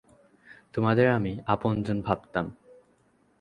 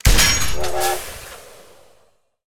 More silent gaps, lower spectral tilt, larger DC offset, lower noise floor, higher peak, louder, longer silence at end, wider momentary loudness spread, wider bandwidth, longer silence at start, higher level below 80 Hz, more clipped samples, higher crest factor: neither; first, -9 dB/octave vs -2 dB/octave; neither; first, -65 dBFS vs -59 dBFS; second, -6 dBFS vs 0 dBFS; second, -27 LUFS vs -18 LUFS; first, 0.9 s vs 0 s; second, 10 LU vs 22 LU; second, 9.8 kHz vs 16 kHz; first, 0.5 s vs 0 s; second, -54 dBFS vs -26 dBFS; neither; about the same, 22 dB vs 18 dB